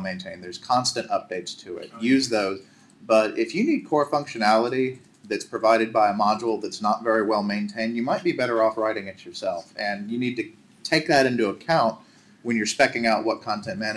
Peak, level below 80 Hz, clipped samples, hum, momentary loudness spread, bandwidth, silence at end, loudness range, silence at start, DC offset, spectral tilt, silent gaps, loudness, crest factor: -4 dBFS; -68 dBFS; under 0.1%; none; 13 LU; 12.5 kHz; 0 s; 3 LU; 0 s; under 0.1%; -4.5 dB/octave; none; -23 LUFS; 20 dB